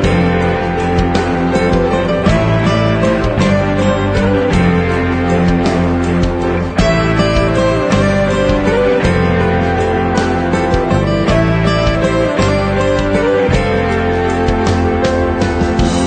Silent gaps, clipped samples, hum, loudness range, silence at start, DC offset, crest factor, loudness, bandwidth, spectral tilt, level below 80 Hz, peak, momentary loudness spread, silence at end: none; under 0.1%; none; 1 LU; 0 s; under 0.1%; 12 dB; -13 LUFS; 9.4 kHz; -6.5 dB/octave; -24 dBFS; 0 dBFS; 2 LU; 0 s